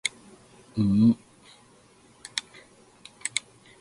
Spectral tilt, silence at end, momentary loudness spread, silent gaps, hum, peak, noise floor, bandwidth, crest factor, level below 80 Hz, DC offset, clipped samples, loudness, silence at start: -4.5 dB/octave; 0.4 s; 15 LU; none; none; -4 dBFS; -57 dBFS; 11.5 kHz; 24 dB; -58 dBFS; under 0.1%; under 0.1%; -27 LUFS; 0.05 s